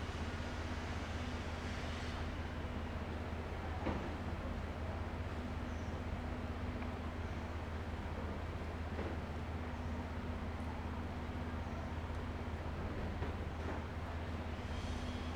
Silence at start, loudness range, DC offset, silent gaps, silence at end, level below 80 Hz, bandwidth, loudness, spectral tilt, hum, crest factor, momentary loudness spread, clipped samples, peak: 0 s; 1 LU; under 0.1%; none; 0 s; -48 dBFS; 11 kHz; -43 LUFS; -6.5 dB/octave; none; 16 dB; 1 LU; under 0.1%; -26 dBFS